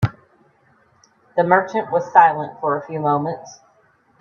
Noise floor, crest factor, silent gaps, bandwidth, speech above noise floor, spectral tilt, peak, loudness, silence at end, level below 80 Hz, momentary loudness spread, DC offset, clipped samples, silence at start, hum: -58 dBFS; 20 dB; none; 7 kHz; 40 dB; -7 dB/octave; 0 dBFS; -18 LUFS; 0.65 s; -56 dBFS; 12 LU; under 0.1%; under 0.1%; 0 s; none